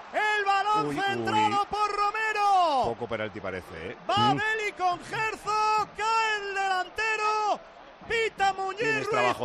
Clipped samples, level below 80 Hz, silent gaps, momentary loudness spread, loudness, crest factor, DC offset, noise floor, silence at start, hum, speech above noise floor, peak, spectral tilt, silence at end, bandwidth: under 0.1%; -60 dBFS; none; 9 LU; -26 LUFS; 14 dB; under 0.1%; -48 dBFS; 0 s; none; 20 dB; -14 dBFS; -3.5 dB/octave; 0 s; 13 kHz